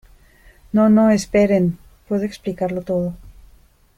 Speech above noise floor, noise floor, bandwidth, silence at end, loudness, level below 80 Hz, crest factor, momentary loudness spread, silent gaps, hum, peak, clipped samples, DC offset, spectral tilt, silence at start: 34 dB; -51 dBFS; 12.5 kHz; 0.65 s; -18 LUFS; -46 dBFS; 16 dB; 12 LU; none; none; -4 dBFS; under 0.1%; under 0.1%; -7 dB/octave; 0.75 s